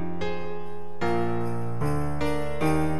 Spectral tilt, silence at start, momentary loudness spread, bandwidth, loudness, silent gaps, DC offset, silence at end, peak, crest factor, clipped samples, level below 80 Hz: -7 dB/octave; 0 s; 10 LU; 15 kHz; -29 LUFS; none; 5%; 0 s; -12 dBFS; 14 dB; under 0.1%; -44 dBFS